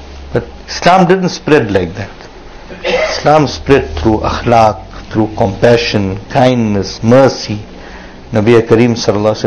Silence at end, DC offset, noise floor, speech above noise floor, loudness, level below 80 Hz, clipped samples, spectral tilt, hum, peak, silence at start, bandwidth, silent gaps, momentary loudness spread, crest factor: 0 s; under 0.1%; -31 dBFS; 20 dB; -11 LUFS; -30 dBFS; 2%; -6 dB/octave; none; 0 dBFS; 0 s; 11 kHz; none; 15 LU; 12 dB